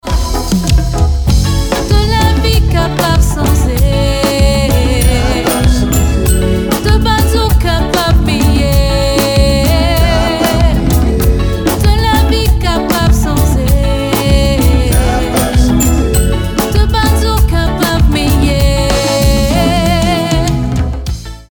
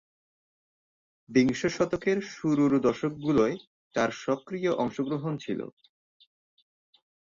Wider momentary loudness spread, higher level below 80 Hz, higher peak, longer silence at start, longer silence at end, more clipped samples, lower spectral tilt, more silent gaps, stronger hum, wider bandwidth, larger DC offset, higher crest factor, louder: second, 3 LU vs 10 LU; first, -14 dBFS vs -64 dBFS; first, 0 dBFS vs -10 dBFS; second, 0.05 s vs 1.3 s; second, 0.05 s vs 1.7 s; neither; about the same, -5.5 dB/octave vs -6 dB/octave; second, none vs 3.67-3.91 s; neither; first, over 20 kHz vs 7.6 kHz; neither; second, 10 dB vs 20 dB; first, -11 LUFS vs -28 LUFS